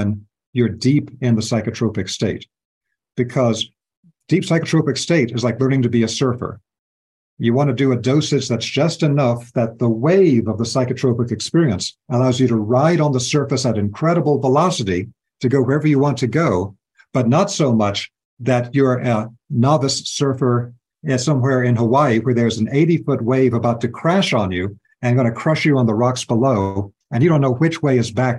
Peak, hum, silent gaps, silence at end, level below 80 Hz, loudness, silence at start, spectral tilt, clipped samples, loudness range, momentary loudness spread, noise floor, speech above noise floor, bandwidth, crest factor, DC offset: -2 dBFS; none; 0.47-0.53 s, 2.65-2.81 s, 3.97-4.03 s, 6.79-7.37 s, 18.25-18.37 s; 0 s; -54 dBFS; -18 LUFS; 0 s; -6 dB/octave; under 0.1%; 3 LU; 8 LU; under -90 dBFS; over 73 dB; 11.5 kHz; 16 dB; under 0.1%